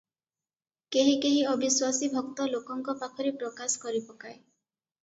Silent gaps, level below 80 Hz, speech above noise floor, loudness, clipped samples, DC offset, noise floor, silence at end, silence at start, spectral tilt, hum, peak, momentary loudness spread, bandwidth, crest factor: none; -78 dBFS; over 61 dB; -28 LUFS; under 0.1%; under 0.1%; under -90 dBFS; 0.65 s; 0.9 s; -2 dB/octave; none; -12 dBFS; 10 LU; 8 kHz; 18 dB